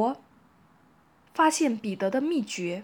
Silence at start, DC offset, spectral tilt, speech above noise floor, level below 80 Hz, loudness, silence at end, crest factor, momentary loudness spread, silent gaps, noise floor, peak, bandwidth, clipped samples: 0 s; under 0.1%; -4 dB/octave; 35 dB; -76 dBFS; -27 LUFS; 0 s; 18 dB; 11 LU; none; -61 dBFS; -12 dBFS; 19.5 kHz; under 0.1%